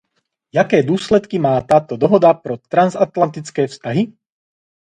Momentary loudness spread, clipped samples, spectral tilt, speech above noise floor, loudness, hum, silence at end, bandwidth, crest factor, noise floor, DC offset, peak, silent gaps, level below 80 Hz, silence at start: 9 LU; under 0.1%; -7 dB/octave; 55 dB; -16 LUFS; none; 0.85 s; 10.5 kHz; 16 dB; -70 dBFS; under 0.1%; 0 dBFS; none; -52 dBFS; 0.55 s